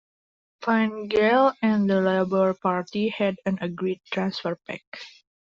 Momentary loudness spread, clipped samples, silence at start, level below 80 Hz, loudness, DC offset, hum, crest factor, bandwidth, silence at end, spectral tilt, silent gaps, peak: 15 LU; under 0.1%; 0.6 s; -64 dBFS; -24 LUFS; under 0.1%; none; 16 dB; 7.4 kHz; 0.35 s; -5 dB/octave; 4.87-4.92 s; -8 dBFS